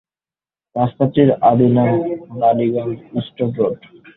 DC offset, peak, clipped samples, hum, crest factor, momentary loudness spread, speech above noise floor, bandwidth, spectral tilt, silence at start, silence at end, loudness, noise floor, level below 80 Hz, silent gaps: under 0.1%; -2 dBFS; under 0.1%; none; 16 dB; 12 LU; over 74 dB; 4 kHz; -12.5 dB/octave; 0.75 s; 0.4 s; -17 LUFS; under -90 dBFS; -54 dBFS; none